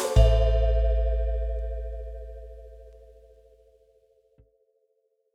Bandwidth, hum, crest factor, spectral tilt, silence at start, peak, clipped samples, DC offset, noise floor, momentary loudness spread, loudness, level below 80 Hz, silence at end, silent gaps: 11.5 kHz; none; 20 dB; -6 dB/octave; 0 s; -6 dBFS; under 0.1%; under 0.1%; -72 dBFS; 24 LU; -26 LUFS; -28 dBFS; 2.45 s; none